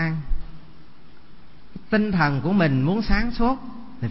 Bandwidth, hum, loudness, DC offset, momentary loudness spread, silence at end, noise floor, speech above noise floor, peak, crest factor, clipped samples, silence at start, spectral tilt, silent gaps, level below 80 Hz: 5.8 kHz; none; -23 LUFS; 2%; 17 LU; 0 s; -49 dBFS; 29 dB; -6 dBFS; 18 dB; under 0.1%; 0 s; -10.5 dB/octave; none; -32 dBFS